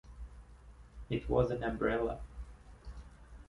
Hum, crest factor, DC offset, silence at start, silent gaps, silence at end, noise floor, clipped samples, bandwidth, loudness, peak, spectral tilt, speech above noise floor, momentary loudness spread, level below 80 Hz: none; 22 dB; under 0.1%; 0.05 s; none; 0.05 s; -55 dBFS; under 0.1%; 11.5 kHz; -35 LUFS; -16 dBFS; -8 dB/octave; 22 dB; 23 LU; -48 dBFS